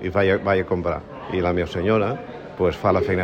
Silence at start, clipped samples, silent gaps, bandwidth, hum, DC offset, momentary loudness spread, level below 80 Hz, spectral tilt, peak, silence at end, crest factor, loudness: 0 s; under 0.1%; none; 8.8 kHz; none; under 0.1%; 9 LU; -44 dBFS; -8 dB/octave; -4 dBFS; 0 s; 16 dB; -22 LUFS